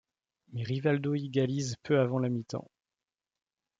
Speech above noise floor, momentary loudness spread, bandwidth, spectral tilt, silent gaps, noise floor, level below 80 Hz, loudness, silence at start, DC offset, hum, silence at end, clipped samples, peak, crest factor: over 60 dB; 12 LU; 7.8 kHz; -6.5 dB/octave; none; under -90 dBFS; -72 dBFS; -31 LUFS; 0.5 s; under 0.1%; none; 1.15 s; under 0.1%; -14 dBFS; 18 dB